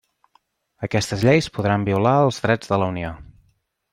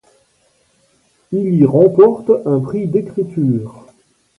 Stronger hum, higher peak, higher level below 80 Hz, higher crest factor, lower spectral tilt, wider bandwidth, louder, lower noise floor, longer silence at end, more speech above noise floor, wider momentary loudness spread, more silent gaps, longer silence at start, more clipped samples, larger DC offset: neither; about the same, -2 dBFS vs 0 dBFS; first, -50 dBFS vs -56 dBFS; about the same, 18 dB vs 16 dB; second, -6 dB/octave vs -11 dB/octave; first, 15.5 kHz vs 10.5 kHz; second, -20 LUFS vs -14 LUFS; first, -65 dBFS vs -58 dBFS; about the same, 0.7 s vs 0.7 s; about the same, 45 dB vs 45 dB; about the same, 13 LU vs 12 LU; neither; second, 0.8 s vs 1.3 s; neither; neither